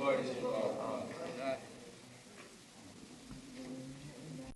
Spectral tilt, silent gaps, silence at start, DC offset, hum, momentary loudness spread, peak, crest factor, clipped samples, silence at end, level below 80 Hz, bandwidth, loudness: -5 dB/octave; none; 0 s; under 0.1%; none; 18 LU; -22 dBFS; 20 dB; under 0.1%; 0 s; -68 dBFS; 12 kHz; -41 LUFS